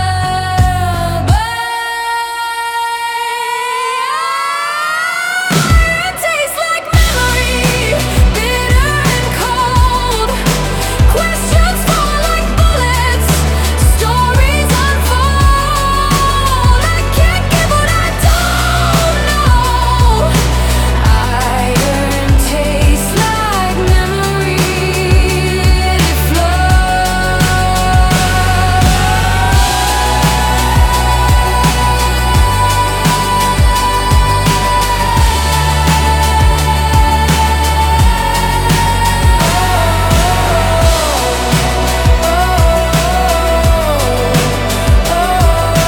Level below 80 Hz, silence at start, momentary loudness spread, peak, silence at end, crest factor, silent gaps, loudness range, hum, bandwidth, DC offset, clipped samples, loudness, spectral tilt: -16 dBFS; 0 s; 3 LU; 0 dBFS; 0 s; 10 dB; none; 2 LU; none; 19 kHz; under 0.1%; under 0.1%; -12 LUFS; -4.5 dB/octave